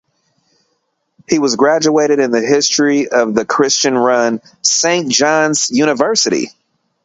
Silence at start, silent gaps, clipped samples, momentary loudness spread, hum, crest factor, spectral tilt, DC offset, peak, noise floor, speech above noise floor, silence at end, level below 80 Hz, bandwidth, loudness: 1.3 s; none; under 0.1%; 4 LU; none; 14 dB; -2.5 dB/octave; under 0.1%; 0 dBFS; -67 dBFS; 54 dB; 0.55 s; -60 dBFS; 8.2 kHz; -13 LUFS